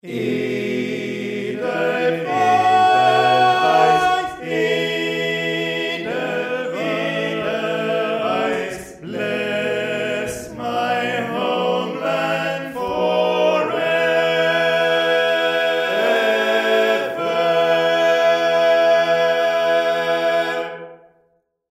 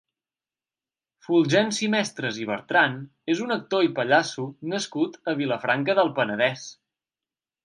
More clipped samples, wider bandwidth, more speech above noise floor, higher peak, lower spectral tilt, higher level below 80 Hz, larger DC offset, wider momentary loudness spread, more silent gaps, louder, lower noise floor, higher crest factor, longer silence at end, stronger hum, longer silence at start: neither; first, 15.5 kHz vs 11.5 kHz; second, 43 dB vs over 66 dB; about the same, -2 dBFS vs -4 dBFS; about the same, -4.5 dB/octave vs -4.5 dB/octave; first, -58 dBFS vs -74 dBFS; neither; about the same, 9 LU vs 9 LU; neither; first, -18 LUFS vs -24 LUFS; second, -63 dBFS vs under -90 dBFS; second, 16 dB vs 22 dB; second, 0.75 s vs 0.9 s; neither; second, 0.05 s vs 1.3 s